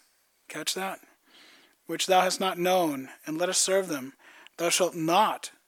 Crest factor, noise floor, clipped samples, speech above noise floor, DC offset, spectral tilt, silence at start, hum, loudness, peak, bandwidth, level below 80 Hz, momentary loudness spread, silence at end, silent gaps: 18 dB; -59 dBFS; under 0.1%; 32 dB; under 0.1%; -2.5 dB/octave; 0.5 s; none; -26 LUFS; -10 dBFS; 19 kHz; -88 dBFS; 13 LU; 0.2 s; none